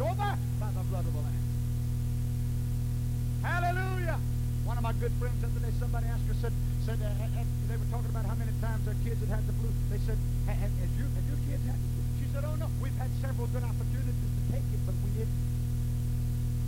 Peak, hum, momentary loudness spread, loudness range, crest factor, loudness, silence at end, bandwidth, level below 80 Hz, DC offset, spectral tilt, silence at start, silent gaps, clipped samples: -18 dBFS; 60 Hz at -35 dBFS; 1 LU; 1 LU; 12 dB; -32 LUFS; 0 s; 16 kHz; -34 dBFS; under 0.1%; -7 dB/octave; 0 s; none; under 0.1%